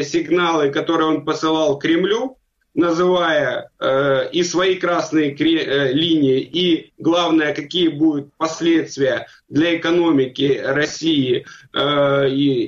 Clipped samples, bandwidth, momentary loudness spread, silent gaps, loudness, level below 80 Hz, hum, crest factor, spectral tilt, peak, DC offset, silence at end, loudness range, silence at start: under 0.1%; 7.6 kHz; 5 LU; none; -18 LUFS; -58 dBFS; none; 12 dB; -5 dB/octave; -6 dBFS; under 0.1%; 0 s; 1 LU; 0 s